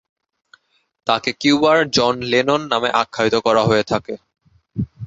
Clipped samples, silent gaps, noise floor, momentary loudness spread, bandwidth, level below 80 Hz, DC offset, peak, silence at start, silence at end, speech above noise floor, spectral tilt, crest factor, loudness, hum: under 0.1%; none; -54 dBFS; 14 LU; 8 kHz; -50 dBFS; under 0.1%; -2 dBFS; 1.05 s; 0 s; 37 dB; -4.5 dB/octave; 18 dB; -17 LUFS; none